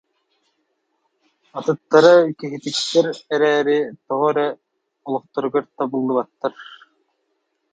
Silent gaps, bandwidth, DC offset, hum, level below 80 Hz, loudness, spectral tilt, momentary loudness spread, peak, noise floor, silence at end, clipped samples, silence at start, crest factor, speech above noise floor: none; 9.2 kHz; under 0.1%; none; -74 dBFS; -19 LUFS; -4.5 dB/octave; 15 LU; 0 dBFS; -71 dBFS; 1 s; under 0.1%; 1.55 s; 20 dB; 53 dB